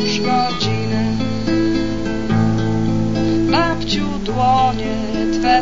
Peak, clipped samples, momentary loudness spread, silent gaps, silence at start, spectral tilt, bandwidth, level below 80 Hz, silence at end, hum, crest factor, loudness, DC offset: -2 dBFS; under 0.1%; 5 LU; none; 0 s; -6 dB/octave; 7.8 kHz; -34 dBFS; 0 s; none; 16 dB; -18 LUFS; 4%